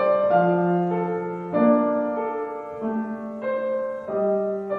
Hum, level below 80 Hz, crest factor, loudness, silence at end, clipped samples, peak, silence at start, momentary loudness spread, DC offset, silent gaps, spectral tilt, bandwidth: none; -66 dBFS; 16 dB; -24 LUFS; 0 s; under 0.1%; -6 dBFS; 0 s; 10 LU; under 0.1%; none; -10 dB/octave; 4.6 kHz